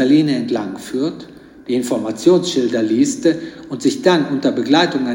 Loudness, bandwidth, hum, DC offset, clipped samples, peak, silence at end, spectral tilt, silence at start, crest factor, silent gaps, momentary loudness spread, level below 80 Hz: -17 LUFS; 16.5 kHz; none; under 0.1%; under 0.1%; 0 dBFS; 0 s; -5 dB/octave; 0 s; 16 dB; none; 10 LU; -58 dBFS